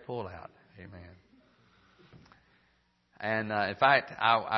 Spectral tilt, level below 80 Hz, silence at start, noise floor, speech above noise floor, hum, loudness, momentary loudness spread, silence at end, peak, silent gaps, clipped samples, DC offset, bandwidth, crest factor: -6.5 dB/octave; -68 dBFS; 0.1 s; -71 dBFS; 41 dB; none; -28 LUFS; 27 LU; 0 s; -8 dBFS; none; under 0.1%; under 0.1%; 6 kHz; 24 dB